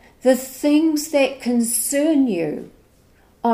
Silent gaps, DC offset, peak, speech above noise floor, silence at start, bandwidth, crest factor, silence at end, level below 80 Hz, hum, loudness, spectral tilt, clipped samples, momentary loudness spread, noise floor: none; under 0.1%; -4 dBFS; 36 dB; 0.25 s; 16 kHz; 16 dB; 0 s; -58 dBFS; none; -19 LUFS; -3.5 dB/octave; under 0.1%; 7 LU; -54 dBFS